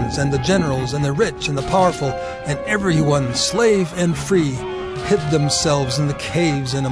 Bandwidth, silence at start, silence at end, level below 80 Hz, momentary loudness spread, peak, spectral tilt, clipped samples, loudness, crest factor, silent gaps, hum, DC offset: 11 kHz; 0 s; 0 s; -38 dBFS; 7 LU; -4 dBFS; -5 dB/octave; under 0.1%; -19 LUFS; 14 dB; none; none; 0.2%